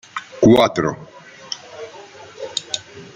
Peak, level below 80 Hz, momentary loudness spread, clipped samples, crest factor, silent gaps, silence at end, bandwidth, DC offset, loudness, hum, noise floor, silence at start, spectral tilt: -2 dBFS; -52 dBFS; 23 LU; under 0.1%; 18 dB; none; 0.1 s; 13 kHz; under 0.1%; -18 LUFS; none; -40 dBFS; 0.15 s; -5 dB/octave